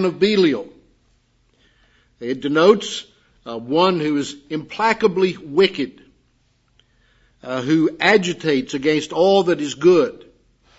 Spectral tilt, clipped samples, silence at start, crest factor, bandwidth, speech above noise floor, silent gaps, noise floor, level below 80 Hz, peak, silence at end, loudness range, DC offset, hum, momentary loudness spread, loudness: -5 dB/octave; under 0.1%; 0 s; 20 dB; 8 kHz; 44 dB; none; -62 dBFS; -62 dBFS; 0 dBFS; 0.65 s; 4 LU; under 0.1%; none; 14 LU; -18 LUFS